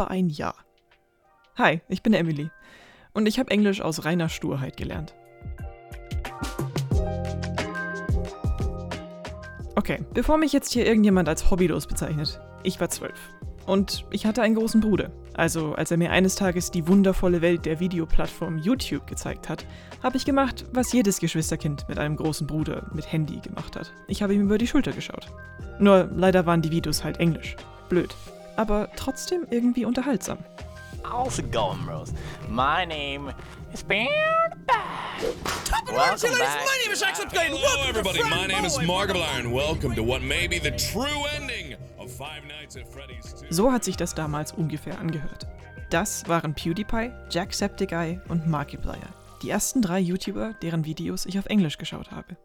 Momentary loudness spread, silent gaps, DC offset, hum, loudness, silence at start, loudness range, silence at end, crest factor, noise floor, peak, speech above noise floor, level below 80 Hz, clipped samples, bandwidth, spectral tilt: 16 LU; none; under 0.1%; none; -25 LUFS; 0 s; 6 LU; 0.1 s; 22 dB; -63 dBFS; -4 dBFS; 38 dB; -38 dBFS; under 0.1%; 19 kHz; -5 dB/octave